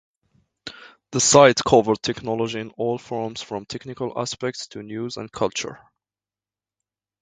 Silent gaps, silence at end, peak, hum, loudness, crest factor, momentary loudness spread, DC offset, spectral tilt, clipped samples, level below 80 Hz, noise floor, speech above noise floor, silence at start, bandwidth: none; 1.45 s; 0 dBFS; 50 Hz at -60 dBFS; -21 LUFS; 24 dB; 20 LU; under 0.1%; -3.5 dB/octave; under 0.1%; -56 dBFS; under -90 dBFS; over 68 dB; 0.65 s; 9.6 kHz